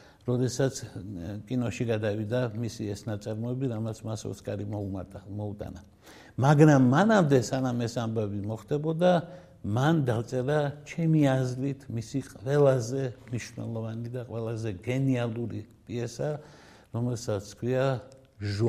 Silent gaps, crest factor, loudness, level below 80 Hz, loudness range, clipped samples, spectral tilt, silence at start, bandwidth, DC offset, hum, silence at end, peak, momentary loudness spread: none; 22 dB; -28 LUFS; -60 dBFS; 8 LU; under 0.1%; -7 dB/octave; 0.25 s; 14 kHz; under 0.1%; none; 0 s; -6 dBFS; 14 LU